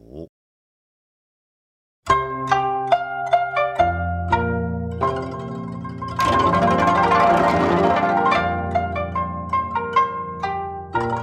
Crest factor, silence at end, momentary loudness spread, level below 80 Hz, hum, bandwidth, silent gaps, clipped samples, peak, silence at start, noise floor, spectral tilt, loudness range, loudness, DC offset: 16 dB; 0 s; 12 LU; -46 dBFS; none; 12.5 kHz; 0.29-2.03 s; under 0.1%; -6 dBFS; 0.1 s; under -90 dBFS; -6.5 dB/octave; 5 LU; -20 LUFS; under 0.1%